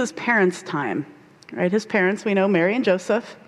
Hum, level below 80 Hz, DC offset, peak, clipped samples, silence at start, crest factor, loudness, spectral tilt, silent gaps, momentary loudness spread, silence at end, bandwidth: none; -70 dBFS; under 0.1%; -6 dBFS; under 0.1%; 0 s; 16 dB; -21 LUFS; -5.5 dB/octave; none; 9 LU; 0.1 s; 12 kHz